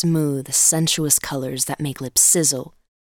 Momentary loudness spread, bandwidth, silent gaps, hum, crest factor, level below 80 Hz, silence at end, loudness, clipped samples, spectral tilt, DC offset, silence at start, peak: 11 LU; 19 kHz; none; none; 18 dB; -54 dBFS; 0.35 s; -17 LUFS; under 0.1%; -3 dB/octave; under 0.1%; 0 s; -2 dBFS